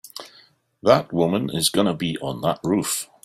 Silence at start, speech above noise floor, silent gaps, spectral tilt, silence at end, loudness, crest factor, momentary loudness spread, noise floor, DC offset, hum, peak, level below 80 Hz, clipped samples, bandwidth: 0.05 s; 34 dB; none; -4.5 dB/octave; 0.2 s; -22 LUFS; 20 dB; 8 LU; -55 dBFS; under 0.1%; none; -2 dBFS; -58 dBFS; under 0.1%; 16 kHz